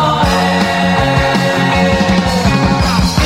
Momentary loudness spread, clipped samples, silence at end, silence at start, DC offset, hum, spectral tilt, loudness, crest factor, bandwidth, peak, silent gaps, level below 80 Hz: 1 LU; under 0.1%; 0 s; 0 s; under 0.1%; none; -5.5 dB/octave; -12 LUFS; 12 dB; 16 kHz; 0 dBFS; none; -24 dBFS